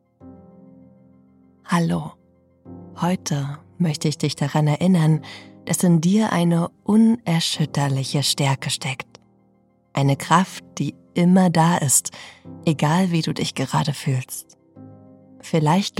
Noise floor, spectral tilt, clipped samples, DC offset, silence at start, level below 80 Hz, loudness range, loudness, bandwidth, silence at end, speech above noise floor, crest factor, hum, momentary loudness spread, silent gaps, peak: -60 dBFS; -5 dB/octave; under 0.1%; under 0.1%; 0.25 s; -62 dBFS; 6 LU; -20 LUFS; 16 kHz; 0.1 s; 40 dB; 18 dB; none; 14 LU; none; -4 dBFS